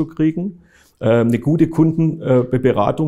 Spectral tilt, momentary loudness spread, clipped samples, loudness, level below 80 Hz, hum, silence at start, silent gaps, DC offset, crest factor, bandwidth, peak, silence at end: -9 dB/octave; 6 LU; under 0.1%; -17 LUFS; -46 dBFS; none; 0 s; none; under 0.1%; 14 dB; 11.5 kHz; -2 dBFS; 0 s